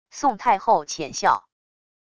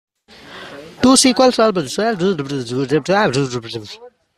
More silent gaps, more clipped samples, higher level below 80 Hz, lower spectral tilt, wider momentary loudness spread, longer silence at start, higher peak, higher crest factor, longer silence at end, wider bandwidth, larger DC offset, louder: neither; neither; second, -60 dBFS vs -52 dBFS; about the same, -3 dB/octave vs -4 dB/octave; second, 6 LU vs 23 LU; second, 0.15 s vs 0.45 s; second, -6 dBFS vs 0 dBFS; about the same, 18 dB vs 18 dB; first, 0.8 s vs 0.3 s; second, 11 kHz vs 13.5 kHz; neither; second, -22 LUFS vs -15 LUFS